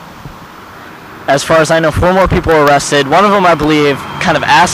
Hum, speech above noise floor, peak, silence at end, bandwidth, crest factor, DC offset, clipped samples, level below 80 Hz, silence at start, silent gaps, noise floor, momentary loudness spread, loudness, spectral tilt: none; 23 dB; 0 dBFS; 0 s; 16 kHz; 10 dB; under 0.1%; under 0.1%; -30 dBFS; 0 s; none; -32 dBFS; 22 LU; -9 LUFS; -4.5 dB/octave